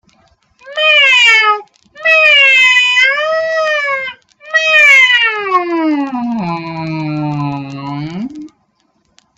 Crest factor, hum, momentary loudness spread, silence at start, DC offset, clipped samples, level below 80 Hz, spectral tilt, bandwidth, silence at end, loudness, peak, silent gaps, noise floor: 12 dB; none; 18 LU; 0.65 s; under 0.1%; under 0.1%; -58 dBFS; -3.5 dB/octave; 15 kHz; 0.9 s; -9 LUFS; 0 dBFS; none; -59 dBFS